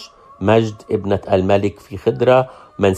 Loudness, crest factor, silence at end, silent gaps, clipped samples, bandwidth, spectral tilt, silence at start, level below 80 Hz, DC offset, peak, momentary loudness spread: -17 LUFS; 16 dB; 0 s; none; under 0.1%; 14 kHz; -7 dB/octave; 0 s; -52 dBFS; under 0.1%; 0 dBFS; 9 LU